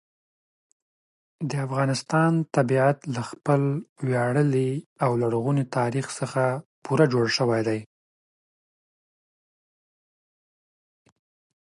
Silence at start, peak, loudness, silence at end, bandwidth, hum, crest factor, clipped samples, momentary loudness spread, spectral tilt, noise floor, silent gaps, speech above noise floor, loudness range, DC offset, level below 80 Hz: 1.4 s; -6 dBFS; -24 LUFS; 3.75 s; 11.5 kHz; none; 20 dB; under 0.1%; 8 LU; -6.5 dB/octave; under -90 dBFS; 3.89-3.96 s, 4.86-4.96 s, 6.65-6.82 s; over 66 dB; 4 LU; under 0.1%; -70 dBFS